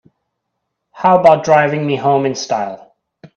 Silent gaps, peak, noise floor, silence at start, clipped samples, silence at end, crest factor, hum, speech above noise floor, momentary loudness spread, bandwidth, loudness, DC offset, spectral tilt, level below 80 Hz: none; 0 dBFS; -74 dBFS; 0.95 s; under 0.1%; 0.1 s; 16 dB; none; 61 dB; 10 LU; 8.2 kHz; -13 LUFS; under 0.1%; -5.5 dB/octave; -58 dBFS